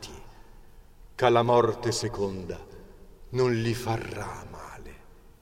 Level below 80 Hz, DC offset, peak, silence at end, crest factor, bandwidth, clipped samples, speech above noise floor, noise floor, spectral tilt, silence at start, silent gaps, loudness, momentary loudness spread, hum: -50 dBFS; under 0.1%; -6 dBFS; 0.25 s; 22 dB; 16 kHz; under 0.1%; 24 dB; -50 dBFS; -5.5 dB/octave; 0 s; none; -27 LUFS; 22 LU; none